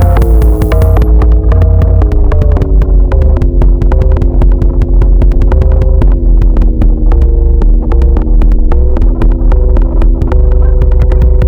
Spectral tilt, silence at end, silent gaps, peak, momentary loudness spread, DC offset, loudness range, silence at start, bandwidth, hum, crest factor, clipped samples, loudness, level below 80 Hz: -9.5 dB/octave; 0 s; none; 0 dBFS; 3 LU; under 0.1%; 2 LU; 0 s; 3.5 kHz; none; 4 dB; under 0.1%; -10 LUFS; -6 dBFS